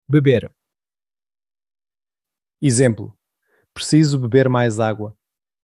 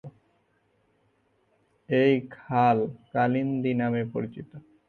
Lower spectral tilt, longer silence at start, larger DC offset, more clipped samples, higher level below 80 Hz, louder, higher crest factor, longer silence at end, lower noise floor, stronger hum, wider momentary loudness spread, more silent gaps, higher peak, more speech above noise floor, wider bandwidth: second, -6 dB/octave vs -9 dB/octave; about the same, 0.1 s vs 0.05 s; neither; neither; first, -58 dBFS vs -66 dBFS; first, -17 LUFS vs -26 LUFS; about the same, 18 dB vs 18 dB; first, 0.5 s vs 0.3 s; first, under -90 dBFS vs -69 dBFS; neither; first, 15 LU vs 12 LU; neither; first, -2 dBFS vs -10 dBFS; first, over 74 dB vs 44 dB; first, 12 kHz vs 6.2 kHz